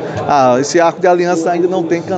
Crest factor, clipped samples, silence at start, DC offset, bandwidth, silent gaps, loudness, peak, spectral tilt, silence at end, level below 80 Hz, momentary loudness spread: 12 dB; under 0.1%; 0 s; under 0.1%; 8.8 kHz; none; -12 LUFS; 0 dBFS; -5 dB/octave; 0 s; -56 dBFS; 4 LU